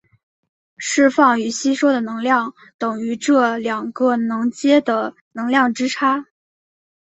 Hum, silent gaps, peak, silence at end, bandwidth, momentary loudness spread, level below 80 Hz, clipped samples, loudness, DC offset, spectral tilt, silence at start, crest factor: none; 2.74-2.79 s, 5.21-5.31 s; -2 dBFS; 0.75 s; 8.4 kHz; 9 LU; -66 dBFS; under 0.1%; -18 LUFS; under 0.1%; -3.5 dB/octave; 0.8 s; 18 dB